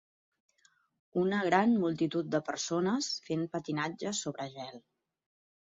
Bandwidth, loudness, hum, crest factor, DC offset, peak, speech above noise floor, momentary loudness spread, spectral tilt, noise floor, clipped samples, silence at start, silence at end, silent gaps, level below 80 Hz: 7.8 kHz; -32 LUFS; none; 22 dB; under 0.1%; -12 dBFS; 38 dB; 12 LU; -4.5 dB/octave; -70 dBFS; under 0.1%; 1.15 s; 0.9 s; none; -76 dBFS